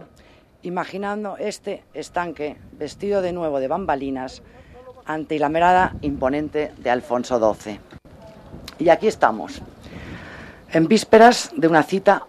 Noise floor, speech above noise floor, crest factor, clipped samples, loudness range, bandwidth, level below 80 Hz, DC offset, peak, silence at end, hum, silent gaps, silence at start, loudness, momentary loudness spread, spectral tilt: -51 dBFS; 31 dB; 20 dB; under 0.1%; 8 LU; 14 kHz; -48 dBFS; under 0.1%; 0 dBFS; 0.05 s; none; none; 0 s; -20 LUFS; 21 LU; -5 dB/octave